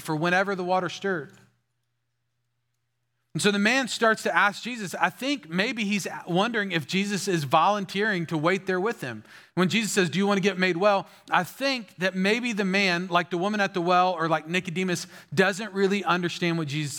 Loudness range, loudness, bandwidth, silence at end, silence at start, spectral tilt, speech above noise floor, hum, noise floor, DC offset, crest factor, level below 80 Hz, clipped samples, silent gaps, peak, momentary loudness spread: 3 LU; -25 LUFS; 17.5 kHz; 0 s; 0 s; -4.5 dB/octave; 53 dB; none; -79 dBFS; under 0.1%; 20 dB; -78 dBFS; under 0.1%; none; -6 dBFS; 7 LU